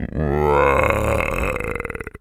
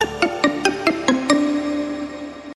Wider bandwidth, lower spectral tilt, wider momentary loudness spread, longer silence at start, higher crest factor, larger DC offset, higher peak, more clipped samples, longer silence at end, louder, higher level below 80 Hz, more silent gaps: first, 16 kHz vs 12 kHz; first, -6.5 dB/octave vs -3.5 dB/octave; about the same, 11 LU vs 11 LU; about the same, 0 s vs 0 s; about the same, 18 dB vs 20 dB; neither; about the same, 0 dBFS vs 0 dBFS; neither; about the same, 0.05 s vs 0 s; about the same, -19 LUFS vs -20 LUFS; first, -30 dBFS vs -50 dBFS; neither